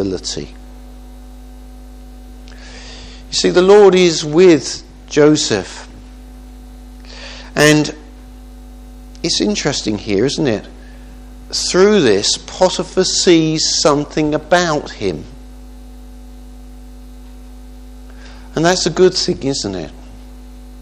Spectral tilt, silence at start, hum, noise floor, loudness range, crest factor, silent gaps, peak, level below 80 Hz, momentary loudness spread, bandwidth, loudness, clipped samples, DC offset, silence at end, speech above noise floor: -4 dB/octave; 0 s; none; -35 dBFS; 10 LU; 16 dB; none; 0 dBFS; -36 dBFS; 23 LU; 14 kHz; -14 LUFS; under 0.1%; under 0.1%; 0 s; 22 dB